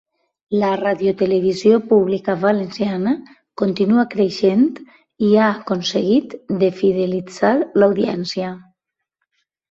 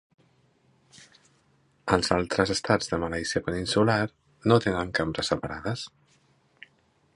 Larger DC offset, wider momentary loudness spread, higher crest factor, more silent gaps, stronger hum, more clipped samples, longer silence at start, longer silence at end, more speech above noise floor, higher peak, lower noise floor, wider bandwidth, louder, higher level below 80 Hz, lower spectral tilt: neither; about the same, 8 LU vs 10 LU; second, 16 dB vs 24 dB; neither; neither; neither; second, 0.5 s vs 1 s; second, 1.1 s vs 1.3 s; first, 61 dB vs 40 dB; about the same, -2 dBFS vs -4 dBFS; first, -78 dBFS vs -66 dBFS; second, 7.8 kHz vs 11.5 kHz; first, -18 LUFS vs -26 LUFS; second, -60 dBFS vs -50 dBFS; first, -6.5 dB/octave vs -5 dB/octave